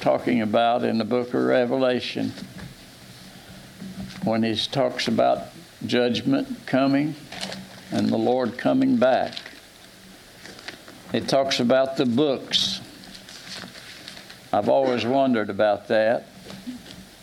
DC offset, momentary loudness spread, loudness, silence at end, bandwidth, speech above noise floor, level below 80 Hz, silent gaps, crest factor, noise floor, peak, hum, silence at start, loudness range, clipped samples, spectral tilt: under 0.1%; 20 LU; -23 LUFS; 0.15 s; 16 kHz; 25 dB; -60 dBFS; none; 18 dB; -47 dBFS; -6 dBFS; none; 0 s; 3 LU; under 0.1%; -5 dB/octave